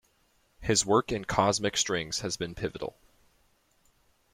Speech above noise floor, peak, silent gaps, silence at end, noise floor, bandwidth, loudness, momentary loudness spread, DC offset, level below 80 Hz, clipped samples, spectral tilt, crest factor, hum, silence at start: 40 dB; -8 dBFS; none; 1.45 s; -69 dBFS; 16.5 kHz; -28 LUFS; 12 LU; under 0.1%; -54 dBFS; under 0.1%; -3 dB/octave; 24 dB; none; 0.6 s